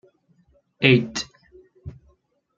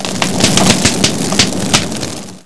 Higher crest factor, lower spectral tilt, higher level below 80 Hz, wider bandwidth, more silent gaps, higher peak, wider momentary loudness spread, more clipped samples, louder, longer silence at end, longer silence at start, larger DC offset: first, 24 dB vs 14 dB; first, -5.5 dB/octave vs -3 dB/octave; second, -56 dBFS vs -38 dBFS; second, 7.6 kHz vs 11 kHz; neither; about the same, -2 dBFS vs 0 dBFS; first, 26 LU vs 11 LU; second, under 0.1% vs 0.5%; second, -20 LUFS vs -11 LUFS; first, 0.7 s vs 0 s; first, 0.8 s vs 0 s; second, under 0.1% vs 6%